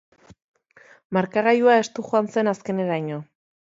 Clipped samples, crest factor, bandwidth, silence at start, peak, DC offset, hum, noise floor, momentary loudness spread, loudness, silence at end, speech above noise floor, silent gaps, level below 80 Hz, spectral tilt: under 0.1%; 18 dB; 7.8 kHz; 1.1 s; -4 dBFS; under 0.1%; none; -53 dBFS; 10 LU; -22 LUFS; 0.55 s; 32 dB; none; -70 dBFS; -6 dB/octave